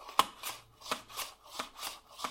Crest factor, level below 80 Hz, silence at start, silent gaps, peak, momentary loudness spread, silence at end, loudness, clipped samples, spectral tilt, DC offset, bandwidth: 30 dB; -70 dBFS; 0 s; none; -8 dBFS; 11 LU; 0 s; -39 LUFS; under 0.1%; -0.5 dB/octave; under 0.1%; 16.5 kHz